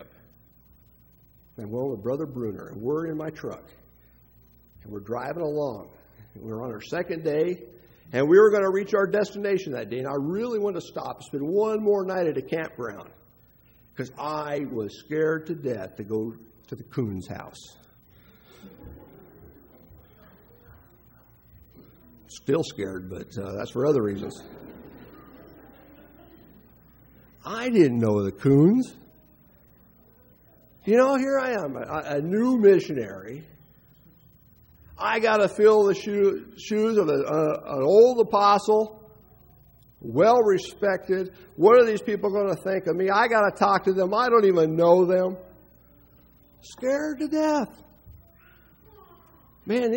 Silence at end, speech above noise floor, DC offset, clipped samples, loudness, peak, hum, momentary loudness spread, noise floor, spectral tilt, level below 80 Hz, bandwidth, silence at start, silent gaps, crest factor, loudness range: 0 s; 34 dB; under 0.1%; under 0.1%; -24 LUFS; -4 dBFS; none; 19 LU; -57 dBFS; -6.5 dB/octave; -60 dBFS; 16 kHz; 0 s; none; 20 dB; 13 LU